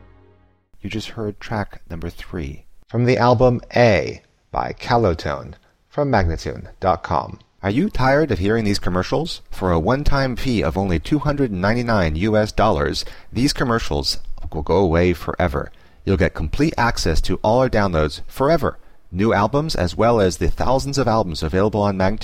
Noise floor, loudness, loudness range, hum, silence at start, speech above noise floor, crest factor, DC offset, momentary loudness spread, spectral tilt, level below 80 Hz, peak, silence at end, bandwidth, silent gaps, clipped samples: -54 dBFS; -20 LUFS; 3 LU; none; 0.8 s; 36 dB; 16 dB; under 0.1%; 13 LU; -6 dB/octave; -30 dBFS; -4 dBFS; 0 s; 16 kHz; none; under 0.1%